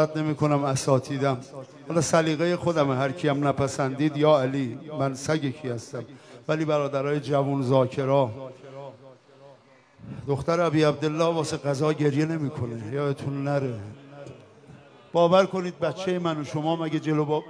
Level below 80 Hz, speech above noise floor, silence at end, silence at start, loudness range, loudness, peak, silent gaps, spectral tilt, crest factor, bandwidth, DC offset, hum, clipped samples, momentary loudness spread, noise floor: -62 dBFS; 30 dB; 0 s; 0 s; 4 LU; -25 LUFS; -6 dBFS; none; -6 dB/octave; 20 dB; 11 kHz; under 0.1%; none; under 0.1%; 17 LU; -55 dBFS